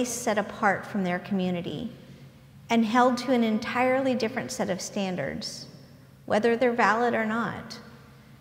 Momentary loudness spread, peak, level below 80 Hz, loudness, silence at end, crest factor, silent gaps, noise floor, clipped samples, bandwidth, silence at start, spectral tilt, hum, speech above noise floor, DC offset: 14 LU; -6 dBFS; -62 dBFS; -26 LUFS; 0.05 s; 20 dB; none; -51 dBFS; under 0.1%; 16 kHz; 0 s; -4.5 dB/octave; none; 25 dB; under 0.1%